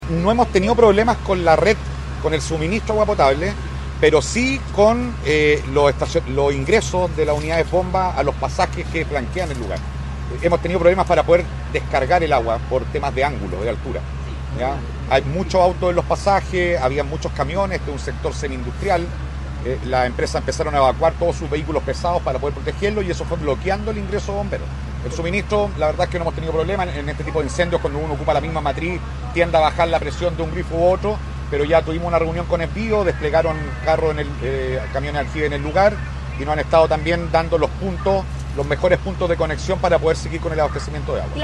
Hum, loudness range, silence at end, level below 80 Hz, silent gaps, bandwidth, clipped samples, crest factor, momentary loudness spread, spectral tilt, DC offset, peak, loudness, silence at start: none; 5 LU; 0 s; -28 dBFS; none; 11.5 kHz; under 0.1%; 18 dB; 9 LU; -6 dB/octave; under 0.1%; 0 dBFS; -20 LUFS; 0 s